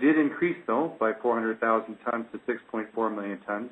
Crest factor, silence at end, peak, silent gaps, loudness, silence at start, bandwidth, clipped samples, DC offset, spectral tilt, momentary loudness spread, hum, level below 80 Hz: 18 dB; 0 s; -10 dBFS; none; -28 LUFS; 0 s; 4 kHz; under 0.1%; under 0.1%; -8.5 dB/octave; 8 LU; none; -76 dBFS